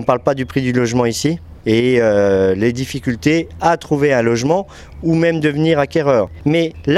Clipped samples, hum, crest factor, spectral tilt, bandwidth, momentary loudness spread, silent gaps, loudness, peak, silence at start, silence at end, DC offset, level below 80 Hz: under 0.1%; none; 16 dB; -6 dB/octave; 14 kHz; 6 LU; none; -16 LUFS; 0 dBFS; 0 s; 0 s; under 0.1%; -42 dBFS